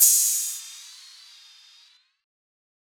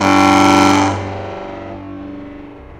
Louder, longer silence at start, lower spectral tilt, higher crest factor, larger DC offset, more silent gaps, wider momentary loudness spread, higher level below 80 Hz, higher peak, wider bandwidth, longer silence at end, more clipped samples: second, -20 LUFS vs -12 LUFS; about the same, 0 s vs 0 s; second, 9 dB/octave vs -4.5 dB/octave; first, 24 dB vs 14 dB; neither; neither; first, 27 LU vs 22 LU; second, under -90 dBFS vs -44 dBFS; about the same, -2 dBFS vs 0 dBFS; first, over 20 kHz vs 15 kHz; first, 1.95 s vs 0 s; neither